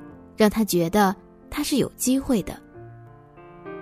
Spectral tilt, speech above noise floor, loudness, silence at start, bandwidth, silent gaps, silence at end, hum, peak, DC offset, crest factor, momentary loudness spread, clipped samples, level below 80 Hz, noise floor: -4.5 dB/octave; 25 dB; -23 LUFS; 0 s; 16 kHz; none; 0 s; none; -6 dBFS; under 0.1%; 20 dB; 23 LU; under 0.1%; -48 dBFS; -46 dBFS